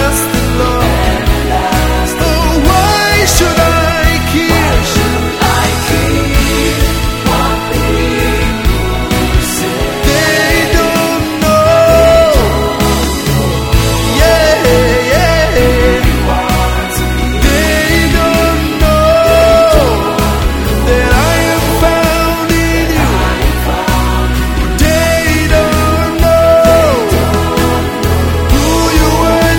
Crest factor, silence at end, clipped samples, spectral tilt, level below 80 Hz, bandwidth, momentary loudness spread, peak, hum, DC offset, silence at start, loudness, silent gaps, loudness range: 10 dB; 0 s; 0.3%; -4.5 dB/octave; -16 dBFS; 19.5 kHz; 6 LU; 0 dBFS; none; under 0.1%; 0 s; -10 LUFS; none; 3 LU